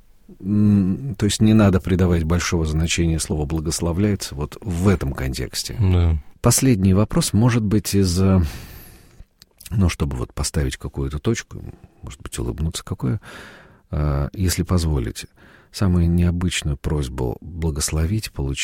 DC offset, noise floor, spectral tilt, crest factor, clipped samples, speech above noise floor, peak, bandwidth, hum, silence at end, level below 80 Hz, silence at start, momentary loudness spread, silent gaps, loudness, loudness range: under 0.1%; -47 dBFS; -5.5 dB/octave; 16 dB; under 0.1%; 27 dB; -4 dBFS; 16.5 kHz; none; 0 s; -30 dBFS; 0.3 s; 13 LU; none; -21 LUFS; 8 LU